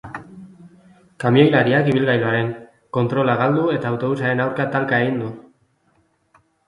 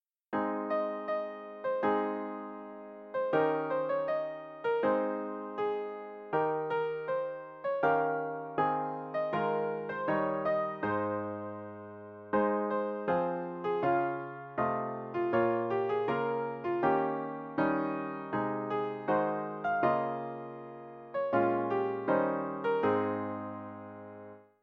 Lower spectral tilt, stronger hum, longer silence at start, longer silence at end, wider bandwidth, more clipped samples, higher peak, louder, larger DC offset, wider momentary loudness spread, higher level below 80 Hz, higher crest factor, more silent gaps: about the same, -8 dB/octave vs -9 dB/octave; neither; second, 0.05 s vs 0.3 s; first, 1.25 s vs 0.2 s; first, 11 kHz vs 5.6 kHz; neither; first, 0 dBFS vs -14 dBFS; first, -19 LUFS vs -33 LUFS; neither; about the same, 13 LU vs 13 LU; first, -58 dBFS vs -72 dBFS; about the same, 20 dB vs 18 dB; neither